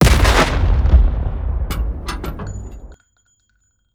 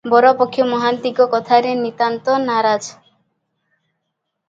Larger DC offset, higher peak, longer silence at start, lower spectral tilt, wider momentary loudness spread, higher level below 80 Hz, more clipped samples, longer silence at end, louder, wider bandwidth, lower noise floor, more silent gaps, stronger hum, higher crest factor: neither; about the same, -2 dBFS vs 0 dBFS; about the same, 0 s vs 0.05 s; about the same, -5 dB/octave vs -4.5 dB/octave; first, 17 LU vs 7 LU; first, -18 dBFS vs -68 dBFS; neither; second, 1 s vs 1.55 s; about the same, -18 LUFS vs -16 LUFS; first, 16.5 kHz vs 7.8 kHz; second, -63 dBFS vs -75 dBFS; neither; neither; about the same, 14 dB vs 18 dB